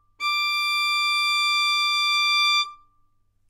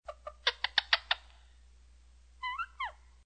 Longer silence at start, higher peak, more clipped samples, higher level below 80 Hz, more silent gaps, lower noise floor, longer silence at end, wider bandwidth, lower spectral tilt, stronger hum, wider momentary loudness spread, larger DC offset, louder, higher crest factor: first, 0.2 s vs 0.05 s; second, -12 dBFS vs -8 dBFS; neither; second, -68 dBFS vs -60 dBFS; neither; first, -63 dBFS vs -59 dBFS; first, 0.75 s vs 0.3 s; first, 16 kHz vs 9 kHz; second, 4.5 dB/octave vs 0.5 dB/octave; second, none vs 60 Hz at -60 dBFS; second, 5 LU vs 12 LU; neither; first, -20 LUFS vs -33 LUFS; second, 12 dB vs 28 dB